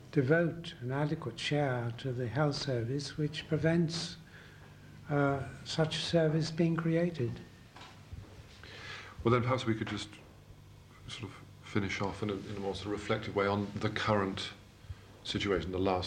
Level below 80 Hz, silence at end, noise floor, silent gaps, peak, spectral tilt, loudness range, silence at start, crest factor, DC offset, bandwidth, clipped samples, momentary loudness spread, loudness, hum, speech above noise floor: -58 dBFS; 0 s; -55 dBFS; none; -14 dBFS; -6 dB/octave; 4 LU; 0 s; 20 dB; under 0.1%; 10.5 kHz; under 0.1%; 21 LU; -33 LUFS; none; 22 dB